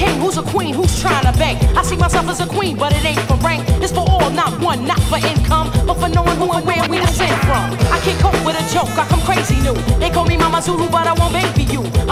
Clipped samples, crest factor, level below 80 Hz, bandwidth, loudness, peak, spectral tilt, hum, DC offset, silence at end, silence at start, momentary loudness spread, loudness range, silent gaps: under 0.1%; 14 dB; -22 dBFS; 16 kHz; -15 LUFS; 0 dBFS; -5 dB/octave; none; under 0.1%; 0 s; 0 s; 3 LU; 0 LU; none